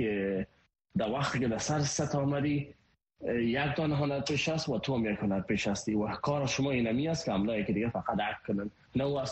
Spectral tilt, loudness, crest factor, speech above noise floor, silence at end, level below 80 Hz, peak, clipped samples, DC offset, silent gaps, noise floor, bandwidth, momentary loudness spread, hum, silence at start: -5.5 dB/octave; -32 LUFS; 16 dB; 37 dB; 0 s; -56 dBFS; -16 dBFS; under 0.1%; under 0.1%; none; -68 dBFS; 8.4 kHz; 5 LU; none; 0 s